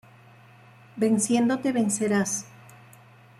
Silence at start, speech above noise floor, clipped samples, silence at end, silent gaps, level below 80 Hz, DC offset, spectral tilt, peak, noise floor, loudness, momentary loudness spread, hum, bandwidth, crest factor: 0.95 s; 28 dB; under 0.1%; 0.9 s; none; -68 dBFS; under 0.1%; -4.5 dB/octave; -12 dBFS; -52 dBFS; -24 LUFS; 13 LU; none; 14.5 kHz; 16 dB